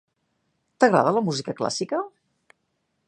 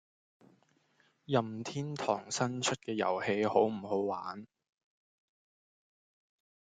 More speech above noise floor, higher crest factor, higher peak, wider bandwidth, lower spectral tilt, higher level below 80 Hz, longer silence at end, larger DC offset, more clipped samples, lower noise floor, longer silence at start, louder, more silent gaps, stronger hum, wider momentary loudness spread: first, 52 dB vs 38 dB; about the same, 22 dB vs 24 dB; first, -2 dBFS vs -12 dBFS; about the same, 10.5 kHz vs 9.6 kHz; about the same, -5 dB/octave vs -4.5 dB/octave; first, -72 dBFS vs -78 dBFS; second, 1 s vs 2.3 s; neither; neither; about the same, -74 dBFS vs -72 dBFS; second, 0.8 s vs 1.3 s; first, -23 LUFS vs -33 LUFS; neither; neither; about the same, 11 LU vs 9 LU